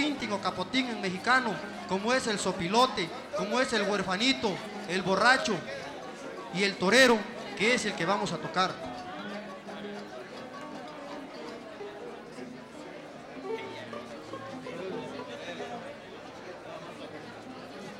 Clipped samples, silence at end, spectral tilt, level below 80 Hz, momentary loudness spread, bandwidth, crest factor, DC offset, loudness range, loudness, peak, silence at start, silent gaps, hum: under 0.1%; 0 s; -3.5 dB/octave; -66 dBFS; 18 LU; 16.5 kHz; 24 dB; under 0.1%; 15 LU; -29 LUFS; -8 dBFS; 0 s; none; none